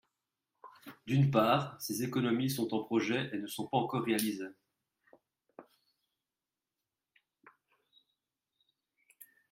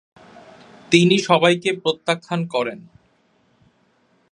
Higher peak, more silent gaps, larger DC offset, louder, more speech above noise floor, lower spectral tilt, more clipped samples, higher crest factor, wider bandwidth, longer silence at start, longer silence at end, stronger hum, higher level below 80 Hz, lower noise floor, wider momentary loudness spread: second, -12 dBFS vs 0 dBFS; neither; neither; second, -33 LUFS vs -18 LUFS; first, over 58 dB vs 43 dB; about the same, -5.5 dB/octave vs -5 dB/octave; neither; about the same, 24 dB vs 22 dB; first, 16 kHz vs 11 kHz; second, 0.65 s vs 0.9 s; second, 0.25 s vs 1.55 s; neither; second, -74 dBFS vs -66 dBFS; first, under -90 dBFS vs -61 dBFS; first, 15 LU vs 10 LU